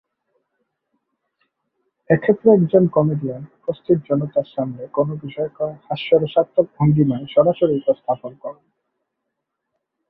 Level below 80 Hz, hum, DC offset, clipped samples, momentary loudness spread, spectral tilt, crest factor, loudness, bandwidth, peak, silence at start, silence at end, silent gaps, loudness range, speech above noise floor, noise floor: -58 dBFS; none; under 0.1%; under 0.1%; 13 LU; -12 dB/octave; 18 dB; -19 LUFS; 4.7 kHz; -2 dBFS; 2.1 s; 1.6 s; none; 3 LU; 60 dB; -78 dBFS